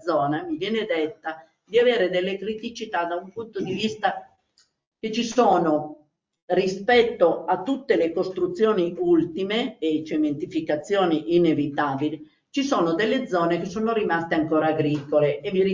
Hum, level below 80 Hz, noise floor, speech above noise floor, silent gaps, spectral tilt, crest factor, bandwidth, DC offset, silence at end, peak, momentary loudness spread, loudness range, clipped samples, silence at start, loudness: none; -62 dBFS; -65 dBFS; 42 dB; 4.87-4.92 s, 6.42-6.48 s; -6 dB/octave; 18 dB; 7.6 kHz; under 0.1%; 0 s; -6 dBFS; 10 LU; 3 LU; under 0.1%; 0.05 s; -23 LUFS